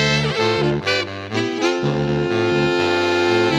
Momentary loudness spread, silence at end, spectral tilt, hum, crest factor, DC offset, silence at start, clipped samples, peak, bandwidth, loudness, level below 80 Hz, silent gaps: 4 LU; 0 s; -5 dB/octave; none; 14 dB; under 0.1%; 0 s; under 0.1%; -4 dBFS; 11 kHz; -19 LUFS; -46 dBFS; none